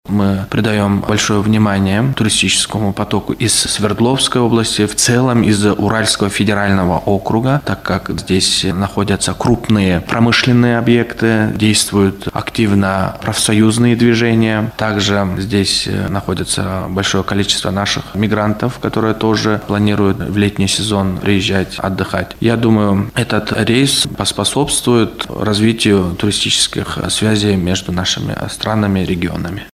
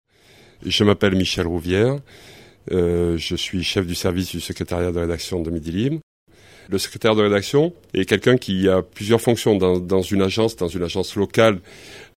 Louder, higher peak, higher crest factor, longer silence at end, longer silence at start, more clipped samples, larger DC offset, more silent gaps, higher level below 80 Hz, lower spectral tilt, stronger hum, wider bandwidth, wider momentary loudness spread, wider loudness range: first, -14 LUFS vs -20 LUFS; about the same, 0 dBFS vs 0 dBFS; second, 14 dB vs 20 dB; about the same, 0.05 s vs 0.1 s; second, 0.05 s vs 0.6 s; neither; neither; second, none vs 6.03-6.26 s; first, -38 dBFS vs -44 dBFS; about the same, -4.5 dB/octave vs -5.5 dB/octave; neither; about the same, 15.5 kHz vs 16 kHz; about the same, 6 LU vs 8 LU; about the same, 3 LU vs 5 LU